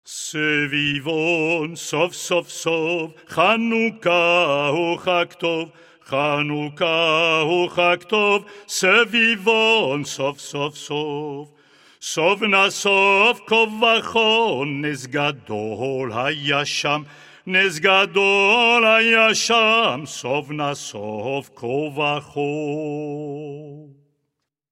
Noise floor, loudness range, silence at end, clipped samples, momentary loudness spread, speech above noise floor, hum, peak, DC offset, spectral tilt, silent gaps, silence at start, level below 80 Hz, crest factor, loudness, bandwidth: -77 dBFS; 7 LU; 0.85 s; under 0.1%; 13 LU; 57 dB; none; -2 dBFS; under 0.1%; -3.5 dB/octave; none; 0.05 s; -66 dBFS; 18 dB; -19 LUFS; 16 kHz